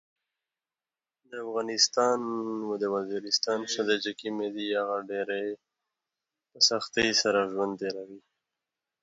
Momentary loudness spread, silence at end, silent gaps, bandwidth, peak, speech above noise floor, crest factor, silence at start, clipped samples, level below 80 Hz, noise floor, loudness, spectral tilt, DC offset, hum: 12 LU; 0.85 s; none; 8 kHz; -8 dBFS; over 61 dB; 22 dB; 1.3 s; under 0.1%; -72 dBFS; under -90 dBFS; -28 LUFS; -2 dB/octave; under 0.1%; none